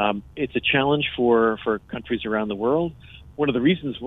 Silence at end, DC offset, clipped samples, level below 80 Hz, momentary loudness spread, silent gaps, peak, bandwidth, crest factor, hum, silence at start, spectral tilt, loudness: 0 s; under 0.1%; under 0.1%; -50 dBFS; 9 LU; none; -6 dBFS; 4 kHz; 18 dB; none; 0 s; -8.5 dB/octave; -23 LUFS